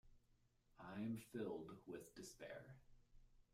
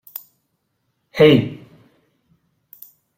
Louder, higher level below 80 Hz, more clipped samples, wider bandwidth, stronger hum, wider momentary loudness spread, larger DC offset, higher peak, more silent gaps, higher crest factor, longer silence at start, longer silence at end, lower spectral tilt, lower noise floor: second, -53 LUFS vs -15 LUFS; second, -74 dBFS vs -56 dBFS; neither; about the same, 15.5 kHz vs 16.5 kHz; neither; second, 12 LU vs 23 LU; neither; second, -36 dBFS vs -2 dBFS; neither; about the same, 18 dB vs 20 dB; second, 0.05 s vs 1.15 s; second, 0.1 s vs 1.65 s; about the same, -6 dB/octave vs -7 dB/octave; first, -78 dBFS vs -71 dBFS